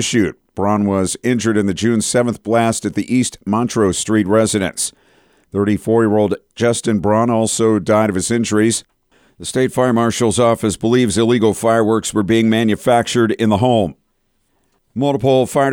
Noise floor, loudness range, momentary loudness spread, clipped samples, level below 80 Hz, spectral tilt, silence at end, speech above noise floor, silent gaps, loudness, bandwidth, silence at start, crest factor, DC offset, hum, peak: -64 dBFS; 2 LU; 6 LU; under 0.1%; -48 dBFS; -5 dB/octave; 0 s; 49 dB; none; -16 LUFS; 17 kHz; 0 s; 12 dB; under 0.1%; none; -2 dBFS